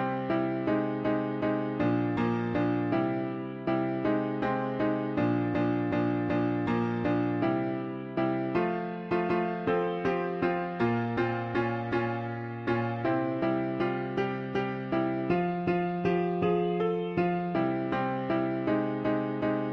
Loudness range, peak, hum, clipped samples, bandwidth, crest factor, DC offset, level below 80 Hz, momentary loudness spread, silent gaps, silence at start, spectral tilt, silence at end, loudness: 1 LU; -16 dBFS; none; under 0.1%; 6.2 kHz; 14 dB; under 0.1%; -60 dBFS; 3 LU; none; 0 s; -9 dB/octave; 0 s; -30 LUFS